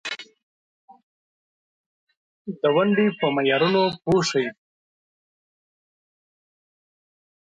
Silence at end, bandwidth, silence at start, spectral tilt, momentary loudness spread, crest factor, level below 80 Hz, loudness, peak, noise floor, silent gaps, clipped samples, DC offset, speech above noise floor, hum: 3.05 s; 9.4 kHz; 0.05 s; -5 dB/octave; 15 LU; 18 dB; -62 dBFS; -21 LUFS; -8 dBFS; under -90 dBFS; 0.43-0.88 s, 1.03-2.07 s, 2.17-2.45 s; under 0.1%; under 0.1%; over 69 dB; none